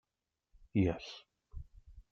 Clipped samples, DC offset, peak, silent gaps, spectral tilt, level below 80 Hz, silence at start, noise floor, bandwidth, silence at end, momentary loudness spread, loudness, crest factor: under 0.1%; under 0.1%; -20 dBFS; none; -8 dB/octave; -56 dBFS; 0.75 s; -89 dBFS; 6.8 kHz; 0.1 s; 22 LU; -35 LUFS; 20 dB